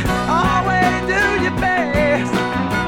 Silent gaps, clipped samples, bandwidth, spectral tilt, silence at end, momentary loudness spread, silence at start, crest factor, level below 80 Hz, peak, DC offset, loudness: none; under 0.1%; 18 kHz; -5.5 dB/octave; 0 s; 3 LU; 0 s; 14 dB; -32 dBFS; -4 dBFS; under 0.1%; -17 LUFS